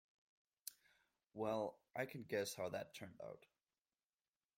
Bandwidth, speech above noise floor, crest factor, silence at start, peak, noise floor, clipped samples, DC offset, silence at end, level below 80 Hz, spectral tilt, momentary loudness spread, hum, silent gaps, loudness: 16.5 kHz; over 44 dB; 22 dB; 0.65 s; -28 dBFS; under -90 dBFS; under 0.1%; under 0.1%; 1.2 s; -86 dBFS; -4 dB/octave; 13 LU; none; none; -47 LUFS